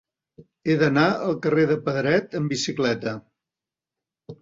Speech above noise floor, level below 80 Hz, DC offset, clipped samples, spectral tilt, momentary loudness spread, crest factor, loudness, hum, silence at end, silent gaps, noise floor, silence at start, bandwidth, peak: 67 dB; -62 dBFS; under 0.1%; under 0.1%; -5.5 dB/octave; 9 LU; 18 dB; -23 LUFS; none; 0.1 s; none; -89 dBFS; 0.65 s; 7.8 kHz; -6 dBFS